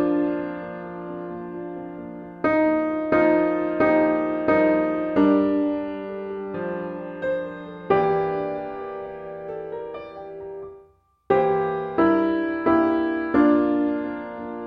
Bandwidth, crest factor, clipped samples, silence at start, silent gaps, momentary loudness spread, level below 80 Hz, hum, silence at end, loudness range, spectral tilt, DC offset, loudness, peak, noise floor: 5.2 kHz; 16 dB; under 0.1%; 0 s; none; 16 LU; -56 dBFS; none; 0 s; 7 LU; -9 dB/octave; under 0.1%; -23 LUFS; -6 dBFS; -56 dBFS